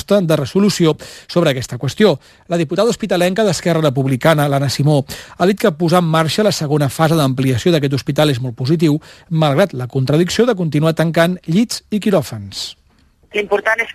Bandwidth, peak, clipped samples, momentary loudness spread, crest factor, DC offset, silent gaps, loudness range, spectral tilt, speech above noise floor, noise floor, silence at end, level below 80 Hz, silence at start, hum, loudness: 14 kHz; 0 dBFS; under 0.1%; 8 LU; 16 dB; under 0.1%; none; 1 LU; -6 dB/octave; 38 dB; -53 dBFS; 0 s; -50 dBFS; 0.1 s; none; -16 LUFS